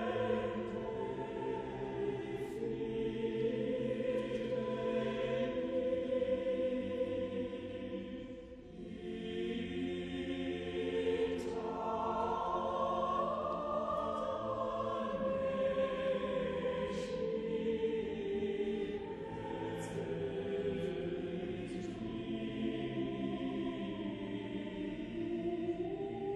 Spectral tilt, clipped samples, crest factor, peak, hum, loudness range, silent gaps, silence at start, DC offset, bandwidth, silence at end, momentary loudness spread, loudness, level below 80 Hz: -7 dB/octave; under 0.1%; 14 dB; -22 dBFS; none; 4 LU; none; 0 s; under 0.1%; 11 kHz; 0 s; 7 LU; -38 LUFS; -60 dBFS